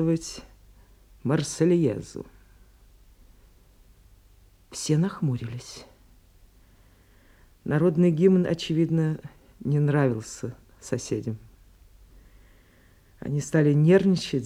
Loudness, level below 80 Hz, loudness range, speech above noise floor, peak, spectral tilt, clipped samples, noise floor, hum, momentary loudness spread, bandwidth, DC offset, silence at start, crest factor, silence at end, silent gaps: -24 LUFS; -56 dBFS; 9 LU; 33 dB; -8 dBFS; -7 dB/octave; under 0.1%; -57 dBFS; none; 20 LU; 12.5 kHz; under 0.1%; 0 s; 18 dB; 0 s; none